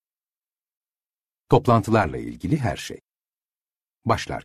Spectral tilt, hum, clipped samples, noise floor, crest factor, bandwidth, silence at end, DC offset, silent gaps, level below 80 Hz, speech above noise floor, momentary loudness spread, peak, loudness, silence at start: -6.5 dB/octave; none; under 0.1%; under -90 dBFS; 22 dB; 13.5 kHz; 0.05 s; under 0.1%; none; -48 dBFS; over 68 dB; 14 LU; -4 dBFS; -23 LUFS; 1.5 s